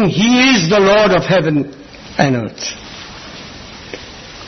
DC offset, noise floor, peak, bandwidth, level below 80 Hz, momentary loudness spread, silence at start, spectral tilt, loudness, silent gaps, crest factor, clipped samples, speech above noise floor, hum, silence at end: under 0.1%; -33 dBFS; 0 dBFS; 6.4 kHz; -42 dBFS; 21 LU; 0 s; -5 dB/octave; -13 LUFS; none; 14 dB; under 0.1%; 21 dB; none; 0 s